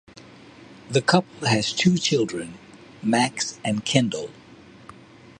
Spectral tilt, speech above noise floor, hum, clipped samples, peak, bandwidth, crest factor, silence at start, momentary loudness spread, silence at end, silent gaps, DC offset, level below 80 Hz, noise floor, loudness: -4.5 dB/octave; 25 dB; none; under 0.1%; -2 dBFS; 11.5 kHz; 22 dB; 0.6 s; 12 LU; 0.85 s; none; under 0.1%; -60 dBFS; -47 dBFS; -23 LUFS